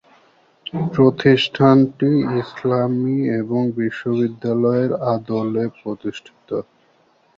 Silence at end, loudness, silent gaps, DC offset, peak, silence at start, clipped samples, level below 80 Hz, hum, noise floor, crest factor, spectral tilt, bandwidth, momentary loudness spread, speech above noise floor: 0.75 s; -19 LUFS; none; under 0.1%; -2 dBFS; 0.75 s; under 0.1%; -58 dBFS; none; -58 dBFS; 18 dB; -8 dB/octave; 7.4 kHz; 14 LU; 40 dB